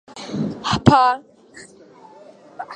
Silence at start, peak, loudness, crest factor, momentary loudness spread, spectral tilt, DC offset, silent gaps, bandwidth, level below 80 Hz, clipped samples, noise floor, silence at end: 0.15 s; 0 dBFS; -18 LUFS; 20 dB; 16 LU; -6 dB/octave; under 0.1%; none; 9.8 kHz; -46 dBFS; under 0.1%; -46 dBFS; 0 s